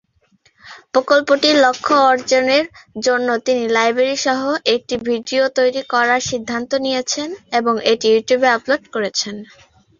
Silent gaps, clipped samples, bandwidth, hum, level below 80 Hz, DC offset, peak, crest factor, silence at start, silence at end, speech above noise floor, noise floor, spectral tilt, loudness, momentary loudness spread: none; under 0.1%; 7.4 kHz; none; -58 dBFS; under 0.1%; -2 dBFS; 16 dB; 0.65 s; 0.55 s; 41 dB; -58 dBFS; -2.5 dB/octave; -16 LUFS; 8 LU